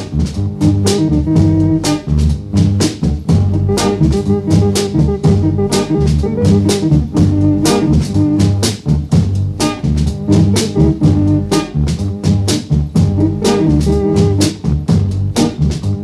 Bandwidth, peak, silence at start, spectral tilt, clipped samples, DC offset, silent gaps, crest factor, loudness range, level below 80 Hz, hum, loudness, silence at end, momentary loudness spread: 13 kHz; -2 dBFS; 0 s; -6.5 dB/octave; under 0.1%; under 0.1%; none; 12 dB; 1 LU; -24 dBFS; none; -13 LUFS; 0 s; 4 LU